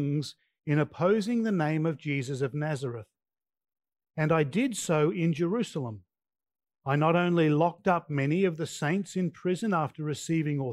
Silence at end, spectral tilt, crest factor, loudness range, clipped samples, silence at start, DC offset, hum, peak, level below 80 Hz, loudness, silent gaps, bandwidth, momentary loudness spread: 0 s; -6.5 dB/octave; 18 dB; 4 LU; under 0.1%; 0 s; under 0.1%; none; -10 dBFS; -72 dBFS; -28 LUFS; none; 12.5 kHz; 10 LU